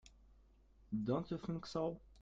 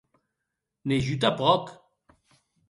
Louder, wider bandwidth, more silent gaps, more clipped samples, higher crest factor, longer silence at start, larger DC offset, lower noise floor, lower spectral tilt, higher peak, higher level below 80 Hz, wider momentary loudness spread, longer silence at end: second, -42 LUFS vs -25 LUFS; second, 7.8 kHz vs 11.5 kHz; neither; neither; about the same, 18 dB vs 22 dB; second, 0.05 s vs 0.85 s; neither; second, -67 dBFS vs -84 dBFS; first, -7.5 dB/octave vs -6 dB/octave; second, -24 dBFS vs -8 dBFS; second, -64 dBFS vs -58 dBFS; second, 4 LU vs 13 LU; second, 0 s vs 0.95 s